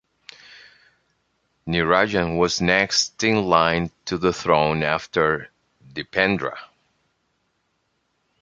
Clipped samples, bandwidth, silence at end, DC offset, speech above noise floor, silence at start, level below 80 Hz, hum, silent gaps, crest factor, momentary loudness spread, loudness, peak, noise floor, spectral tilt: under 0.1%; 9.2 kHz; 1.75 s; under 0.1%; 50 dB; 0.55 s; -48 dBFS; none; none; 22 dB; 13 LU; -20 LUFS; 0 dBFS; -71 dBFS; -4 dB/octave